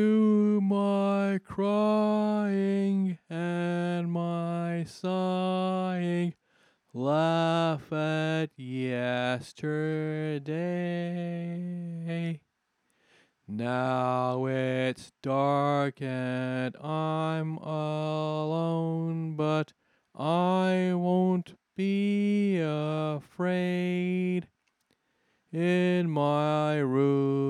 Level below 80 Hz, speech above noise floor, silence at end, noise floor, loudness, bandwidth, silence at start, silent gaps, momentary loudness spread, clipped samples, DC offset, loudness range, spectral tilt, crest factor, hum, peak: -76 dBFS; 49 dB; 0 s; -77 dBFS; -29 LUFS; 11 kHz; 0 s; none; 8 LU; under 0.1%; under 0.1%; 5 LU; -8 dB/octave; 16 dB; none; -14 dBFS